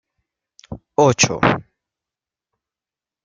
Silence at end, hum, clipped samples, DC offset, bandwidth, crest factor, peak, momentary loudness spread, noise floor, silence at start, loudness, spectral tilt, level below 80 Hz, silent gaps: 1.65 s; none; under 0.1%; under 0.1%; 10 kHz; 22 dB; 0 dBFS; 22 LU; -90 dBFS; 0.7 s; -17 LUFS; -4 dB/octave; -52 dBFS; none